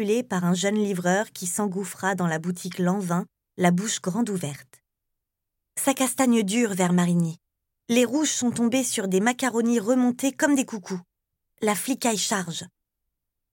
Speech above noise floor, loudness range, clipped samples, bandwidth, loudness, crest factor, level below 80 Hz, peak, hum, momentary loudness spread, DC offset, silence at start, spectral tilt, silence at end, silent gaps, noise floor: 58 dB; 4 LU; under 0.1%; 17 kHz; -24 LUFS; 20 dB; -74 dBFS; -6 dBFS; none; 9 LU; under 0.1%; 0 s; -4.5 dB/octave; 0.85 s; none; -82 dBFS